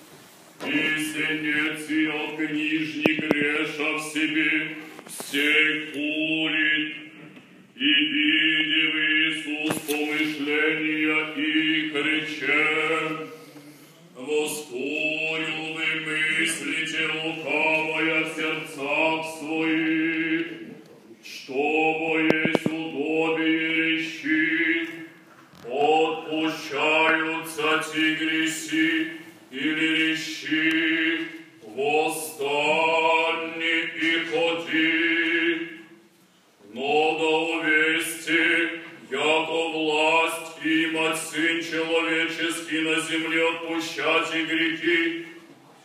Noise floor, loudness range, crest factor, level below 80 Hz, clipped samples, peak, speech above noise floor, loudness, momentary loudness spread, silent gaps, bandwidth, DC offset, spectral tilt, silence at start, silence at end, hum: -58 dBFS; 3 LU; 24 dB; -78 dBFS; under 0.1%; -2 dBFS; 34 dB; -23 LUFS; 9 LU; none; 15.5 kHz; under 0.1%; -3 dB/octave; 0 s; 0.3 s; none